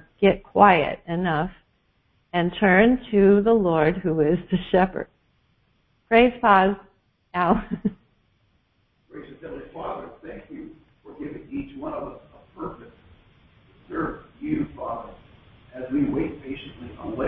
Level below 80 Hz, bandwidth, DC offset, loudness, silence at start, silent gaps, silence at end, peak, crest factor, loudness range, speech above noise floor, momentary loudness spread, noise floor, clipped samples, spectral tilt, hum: -48 dBFS; 4.6 kHz; under 0.1%; -22 LUFS; 0.2 s; none; 0 s; -2 dBFS; 22 dB; 17 LU; 44 dB; 22 LU; -67 dBFS; under 0.1%; -11 dB/octave; none